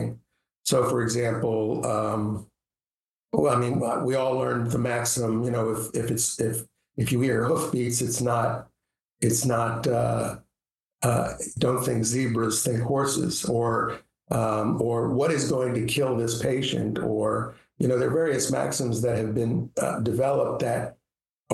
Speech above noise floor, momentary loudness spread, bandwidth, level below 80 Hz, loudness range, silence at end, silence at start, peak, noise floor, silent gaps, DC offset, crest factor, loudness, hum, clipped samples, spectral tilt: over 65 dB; 6 LU; 12.5 kHz; -56 dBFS; 1 LU; 0 s; 0 s; -6 dBFS; under -90 dBFS; 0.57-0.61 s, 2.96-3.29 s, 21.34-21.45 s; under 0.1%; 18 dB; -25 LUFS; none; under 0.1%; -5 dB/octave